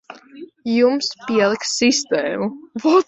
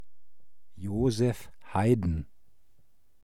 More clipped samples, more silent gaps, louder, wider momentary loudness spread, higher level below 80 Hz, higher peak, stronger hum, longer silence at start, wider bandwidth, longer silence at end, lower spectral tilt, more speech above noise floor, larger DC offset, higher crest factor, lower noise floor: neither; neither; first, -19 LUFS vs -29 LUFS; second, 9 LU vs 15 LU; second, -62 dBFS vs -46 dBFS; first, -2 dBFS vs -12 dBFS; neither; about the same, 0.1 s vs 0 s; second, 8.2 kHz vs 14.5 kHz; about the same, 0.05 s vs 0 s; second, -3 dB/octave vs -7.5 dB/octave; second, 22 dB vs 39 dB; second, under 0.1% vs 0.7%; about the same, 18 dB vs 18 dB; second, -40 dBFS vs -67 dBFS